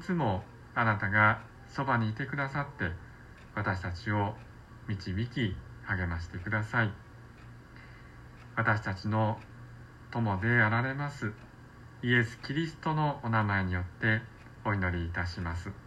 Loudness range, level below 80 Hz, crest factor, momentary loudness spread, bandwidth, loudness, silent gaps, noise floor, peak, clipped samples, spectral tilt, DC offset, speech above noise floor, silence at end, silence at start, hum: 5 LU; -52 dBFS; 22 dB; 24 LU; 8.8 kHz; -31 LUFS; none; -51 dBFS; -10 dBFS; under 0.1%; -7 dB/octave; under 0.1%; 20 dB; 0 s; 0 s; none